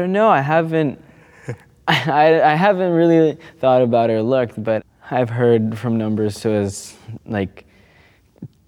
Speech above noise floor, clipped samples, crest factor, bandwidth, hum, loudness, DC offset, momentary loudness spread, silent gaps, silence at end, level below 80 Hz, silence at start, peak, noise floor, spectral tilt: 36 dB; under 0.1%; 16 dB; 15 kHz; none; -17 LUFS; under 0.1%; 15 LU; none; 0.2 s; -58 dBFS; 0 s; 0 dBFS; -52 dBFS; -6.5 dB/octave